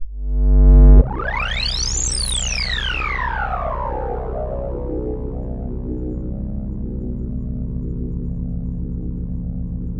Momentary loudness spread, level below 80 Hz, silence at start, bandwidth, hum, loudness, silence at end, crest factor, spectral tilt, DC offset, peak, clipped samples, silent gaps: 13 LU; -20 dBFS; 0 s; 11 kHz; 60 Hz at -55 dBFS; -21 LUFS; 0 s; 18 dB; -4.5 dB/octave; under 0.1%; 0 dBFS; under 0.1%; none